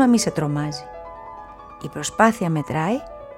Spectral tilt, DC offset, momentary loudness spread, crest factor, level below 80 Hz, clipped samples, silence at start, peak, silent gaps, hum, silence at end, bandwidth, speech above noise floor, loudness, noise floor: -5 dB/octave; under 0.1%; 20 LU; 20 dB; -50 dBFS; under 0.1%; 0 s; -2 dBFS; none; none; 0 s; 15.5 kHz; 19 dB; -22 LUFS; -39 dBFS